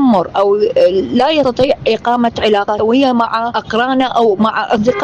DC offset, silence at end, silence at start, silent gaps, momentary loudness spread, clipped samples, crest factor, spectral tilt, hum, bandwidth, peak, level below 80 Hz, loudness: under 0.1%; 0 s; 0 s; none; 3 LU; under 0.1%; 10 dB; -6 dB/octave; none; 9 kHz; -2 dBFS; -44 dBFS; -13 LUFS